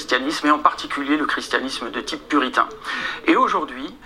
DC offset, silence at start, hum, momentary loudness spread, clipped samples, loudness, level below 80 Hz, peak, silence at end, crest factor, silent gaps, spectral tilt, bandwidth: under 0.1%; 0 s; none; 9 LU; under 0.1%; -21 LUFS; -54 dBFS; 0 dBFS; 0 s; 22 dB; none; -2.5 dB/octave; 14.5 kHz